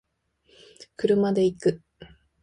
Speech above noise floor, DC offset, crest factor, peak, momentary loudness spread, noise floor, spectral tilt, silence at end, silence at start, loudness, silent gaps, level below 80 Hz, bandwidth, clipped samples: 43 dB; under 0.1%; 18 dB; -8 dBFS; 19 LU; -67 dBFS; -7 dB/octave; 0.35 s; 0.8 s; -24 LUFS; none; -62 dBFS; 11 kHz; under 0.1%